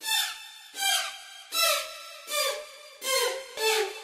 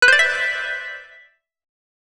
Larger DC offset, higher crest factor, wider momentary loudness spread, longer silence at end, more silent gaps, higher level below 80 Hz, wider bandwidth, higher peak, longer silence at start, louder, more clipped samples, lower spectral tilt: neither; about the same, 20 dB vs 20 dB; second, 16 LU vs 19 LU; second, 0 s vs 1.1 s; neither; second, -78 dBFS vs -58 dBFS; first, 16 kHz vs 13.5 kHz; second, -10 dBFS vs 0 dBFS; about the same, 0 s vs 0 s; second, -27 LUFS vs -18 LUFS; neither; second, 3.5 dB/octave vs 1 dB/octave